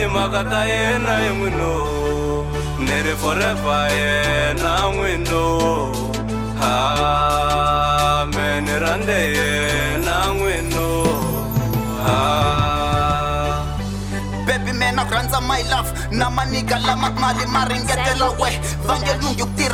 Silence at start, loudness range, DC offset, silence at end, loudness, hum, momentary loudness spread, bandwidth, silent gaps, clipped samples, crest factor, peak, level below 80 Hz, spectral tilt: 0 s; 2 LU; under 0.1%; 0 s; -19 LUFS; none; 5 LU; 16.5 kHz; none; under 0.1%; 14 dB; -4 dBFS; -30 dBFS; -4.5 dB/octave